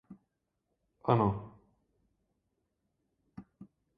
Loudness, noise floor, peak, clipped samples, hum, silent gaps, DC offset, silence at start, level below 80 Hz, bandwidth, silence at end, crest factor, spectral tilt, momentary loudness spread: -31 LUFS; -83 dBFS; -10 dBFS; under 0.1%; none; none; under 0.1%; 0.1 s; -62 dBFS; 4.9 kHz; 0.35 s; 28 dB; -8 dB/octave; 26 LU